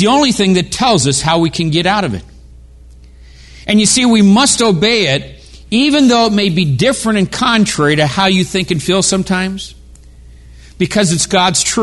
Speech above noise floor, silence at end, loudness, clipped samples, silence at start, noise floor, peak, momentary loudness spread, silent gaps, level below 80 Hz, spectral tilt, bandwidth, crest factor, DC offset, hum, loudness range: 26 dB; 0 s; -12 LUFS; under 0.1%; 0 s; -38 dBFS; 0 dBFS; 8 LU; none; -38 dBFS; -4 dB/octave; 12 kHz; 12 dB; under 0.1%; none; 4 LU